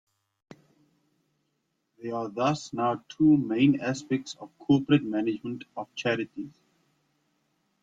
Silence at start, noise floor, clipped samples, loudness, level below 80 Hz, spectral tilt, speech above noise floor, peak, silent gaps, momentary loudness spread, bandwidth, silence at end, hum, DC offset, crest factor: 2 s; -77 dBFS; under 0.1%; -27 LUFS; -68 dBFS; -6.5 dB/octave; 51 dB; -10 dBFS; none; 16 LU; 7.8 kHz; 1.35 s; none; under 0.1%; 18 dB